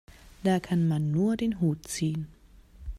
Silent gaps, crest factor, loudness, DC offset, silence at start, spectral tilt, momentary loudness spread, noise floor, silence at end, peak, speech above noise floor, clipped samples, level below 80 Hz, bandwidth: none; 14 dB; -28 LUFS; under 0.1%; 0.25 s; -6.5 dB/octave; 10 LU; -52 dBFS; 0 s; -14 dBFS; 25 dB; under 0.1%; -48 dBFS; 15 kHz